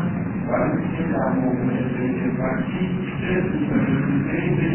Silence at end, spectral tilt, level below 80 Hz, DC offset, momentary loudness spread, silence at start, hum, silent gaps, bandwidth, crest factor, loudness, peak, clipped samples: 0 s; -12 dB/octave; -44 dBFS; under 0.1%; 4 LU; 0 s; none; none; 3.2 kHz; 12 dB; -22 LUFS; -8 dBFS; under 0.1%